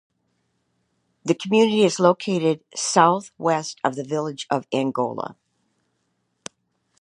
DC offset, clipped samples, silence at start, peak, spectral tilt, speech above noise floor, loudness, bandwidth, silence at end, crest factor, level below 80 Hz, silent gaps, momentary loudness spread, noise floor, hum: under 0.1%; under 0.1%; 1.25 s; -2 dBFS; -4.5 dB/octave; 51 dB; -21 LUFS; 11 kHz; 1.7 s; 22 dB; -74 dBFS; none; 16 LU; -72 dBFS; none